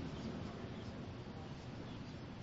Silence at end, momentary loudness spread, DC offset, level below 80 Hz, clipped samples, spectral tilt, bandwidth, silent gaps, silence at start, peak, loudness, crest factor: 0 s; 4 LU; under 0.1%; -60 dBFS; under 0.1%; -6 dB/octave; 7.6 kHz; none; 0 s; -34 dBFS; -48 LUFS; 14 dB